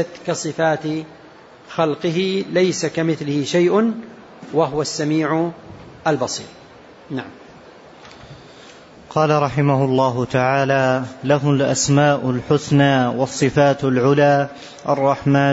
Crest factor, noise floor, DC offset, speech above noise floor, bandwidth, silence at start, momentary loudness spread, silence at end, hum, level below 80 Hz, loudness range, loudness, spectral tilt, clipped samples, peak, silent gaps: 14 dB; -44 dBFS; under 0.1%; 26 dB; 8 kHz; 0 s; 13 LU; 0 s; none; -54 dBFS; 9 LU; -18 LUFS; -5.5 dB/octave; under 0.1%; -4 dBFS; none